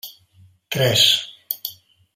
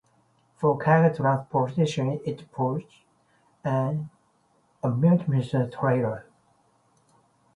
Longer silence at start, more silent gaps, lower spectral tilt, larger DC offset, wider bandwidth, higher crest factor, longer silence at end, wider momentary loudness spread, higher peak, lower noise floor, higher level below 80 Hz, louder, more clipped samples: second, 0.05 s vs 0.6 s; neither; second, -2.5 dB/octave vs -8 dB/octave; neither; first, 16 kHz vs 10.5 kHz; about the same, 22 dB vs 20 dB; second, 0.45 s vs 1.35 s; first, 17 LU vs 13 LU; first, -2 dBFS vs -6 dBFS; second, -53 dBFS vs -66 dBFS; about the same, -62 dBFS vs -64 dBFS; first, -18 LUFS vs -25 LUFS; neither